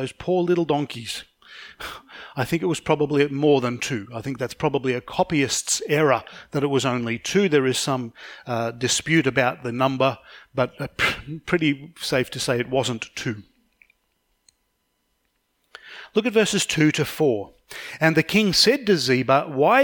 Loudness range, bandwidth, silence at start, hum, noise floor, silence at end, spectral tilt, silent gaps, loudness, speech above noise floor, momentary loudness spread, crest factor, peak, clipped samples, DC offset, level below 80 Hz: 8 LU; 19 kHz; 0 s; none; -72 dBFS; 0 s; -4 dB/octave; none; -22 LUFS; 50 dB; 14 LU; 20 dB; -2 dBFS; under 0.1%; under 0.1%; -56 dBFS